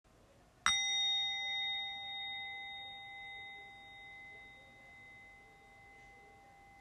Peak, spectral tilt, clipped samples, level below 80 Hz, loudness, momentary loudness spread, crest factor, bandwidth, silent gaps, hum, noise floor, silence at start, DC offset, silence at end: -12 dBFS; 1.5 dB/octave; under 0.1%; -70 dBFS; -36 LUFS; 26 LU; 30 dB; 13.5 kHz; none; none; -65 dBFS; 0.15 s; under 0.1%; 0 s